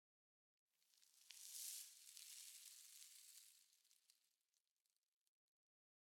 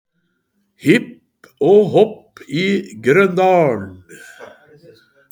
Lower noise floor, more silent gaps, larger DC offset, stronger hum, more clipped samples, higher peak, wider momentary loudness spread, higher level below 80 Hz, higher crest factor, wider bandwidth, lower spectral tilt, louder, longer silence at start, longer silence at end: first, under -90 dBFS vs -68 dBFS; neither; neither; neither; neither; second, -34 dBFS vs 0 dBFS; about the same, 12 LU vs 14 LU; second, under -90 dBFS vs -64 dBFS; first, 30 dB vs 18 dB; about the same, 19 kHz vs over 20 kHz; second, 6 dB/octave vs -6.5 dB/octave; second, -57 LUFS vs -15 LUFS; about the same, 0.8 s vs 0.85 s; first, 2 s vs 0.85 s